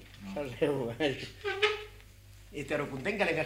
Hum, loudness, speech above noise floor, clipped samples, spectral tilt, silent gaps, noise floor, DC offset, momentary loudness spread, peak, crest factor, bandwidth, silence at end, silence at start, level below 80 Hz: none; -33 LUFS; 21 dB; under 0.1%; -5 dB/octave; none; -53 dBFS; under 0.1%; 12 LU; -14 dBFS; 20 dB; 16 kHz; 0 s; 0 s; -56 dBFS